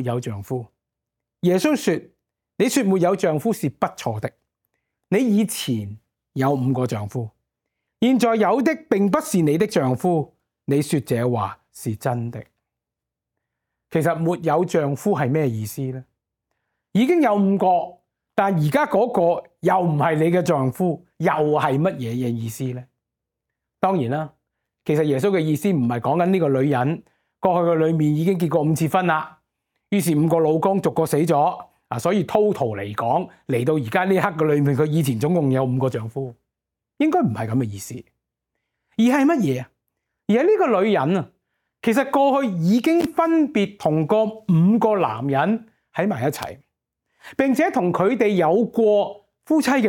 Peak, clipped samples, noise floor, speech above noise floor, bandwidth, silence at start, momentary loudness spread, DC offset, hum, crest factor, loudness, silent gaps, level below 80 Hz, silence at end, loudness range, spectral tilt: -2 dBFS; under 0.1%; -85 dBFS; 66 dB; 17.5 kHz; 0 s; 11 LU; under 0.1%; none; 20 dB; -21 LUFS; none; -62 dBFS; 0 s; 4 LU; -7 dB/octave